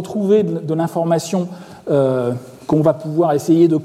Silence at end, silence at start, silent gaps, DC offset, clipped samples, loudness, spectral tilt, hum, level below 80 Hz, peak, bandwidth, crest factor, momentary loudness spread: 0 s; 0 s; none; under 0.1%; under 0.1%; -17 LUFS; -7.5 dB/octave; none; -60 dBFS; -4 dBFS; 14.5 kHz; 14 dB; 9 LU